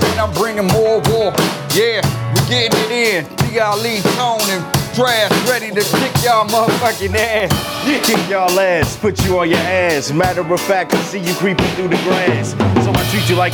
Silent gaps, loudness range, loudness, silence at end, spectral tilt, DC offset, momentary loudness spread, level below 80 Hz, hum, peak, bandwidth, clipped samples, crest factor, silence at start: none; 1 LU; -15 LUFS; 0 s; -4.5 dB/octave; under 0.1%; 4 LU; -40 dBFS; none; 0 dBFS; over 20 kHz; under 0.1%; 14 dB; 0 s